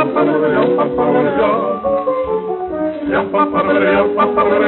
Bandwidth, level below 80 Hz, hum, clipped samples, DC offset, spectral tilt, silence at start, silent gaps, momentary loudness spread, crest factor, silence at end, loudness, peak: 4.2 kHz; -46 dBFS; none; under 0.1%; under 0.1%; -4.5 dB/octave; 0 s; none; 7 LU; 12 dB; 0 s; -15 LUFS; -2 dBFS